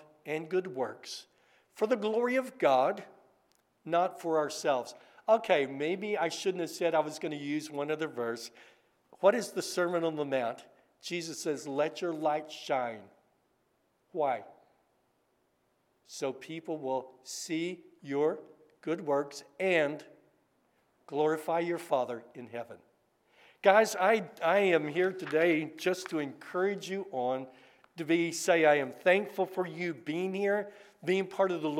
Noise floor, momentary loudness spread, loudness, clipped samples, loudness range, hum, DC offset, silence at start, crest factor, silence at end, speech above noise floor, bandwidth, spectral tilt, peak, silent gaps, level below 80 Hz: -74 dBFS; 15 LU; -31 LUFS; under 0.1%; 9 LU; none; under 0.1%; 0.25 s; 24 dB; 0 s; 43 dB; 16.5 kHz; -4.5 dB/octave; -8 dBFS; none; -90 dBFS